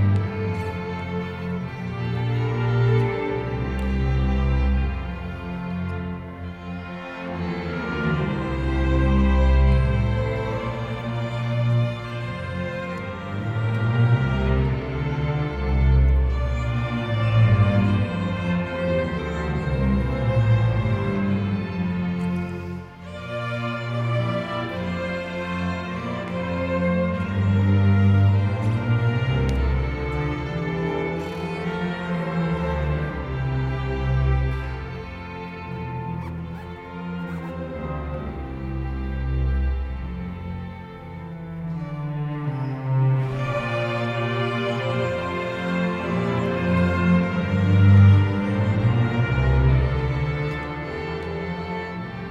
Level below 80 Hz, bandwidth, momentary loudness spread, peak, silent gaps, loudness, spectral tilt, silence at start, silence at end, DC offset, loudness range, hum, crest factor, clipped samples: -30 dBFS; 7.8 kHz; 12 LU; -4 dBFS; none; -24 LUFS; -8.5 dB/octave; 0 s; 0 s; under 0.1%; 10 LU; none; 18 dB; under 0.1%